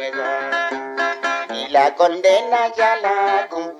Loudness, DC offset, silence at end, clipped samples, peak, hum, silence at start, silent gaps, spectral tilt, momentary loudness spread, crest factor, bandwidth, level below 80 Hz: -18 LUFS; under 0.1%; 0 s; under 0.1%; -2 dBFS; none; 0 s; none; -2 dB/octave; 7 LU; 16 dB; 11 kHz; -74 dBFS